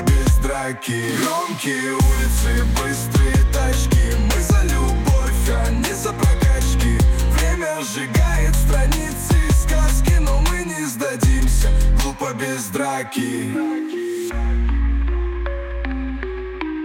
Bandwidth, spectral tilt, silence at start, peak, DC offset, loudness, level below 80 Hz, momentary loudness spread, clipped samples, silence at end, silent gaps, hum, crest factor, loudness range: 17 kHz; -5 dB/octave; 0 s; -6 dBFS; under 0.1%; -20 LUFS; -18 dBFS; 7 LU; under 0.1%; 0 s; none; none; 12 dB; 4 LU